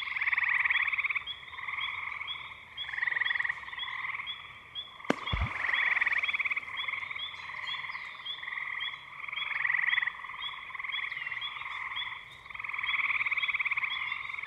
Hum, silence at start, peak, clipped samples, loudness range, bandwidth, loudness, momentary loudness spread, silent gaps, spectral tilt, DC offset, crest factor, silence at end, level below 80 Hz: none; 0 s; -8 dBFS; under 0.1%; 3 LU; 13 kHz; -31 LUFS; 12 LU; none; -3.5 dB/octave; under 0.1%; 26 dB; 0 s; -54 dBFS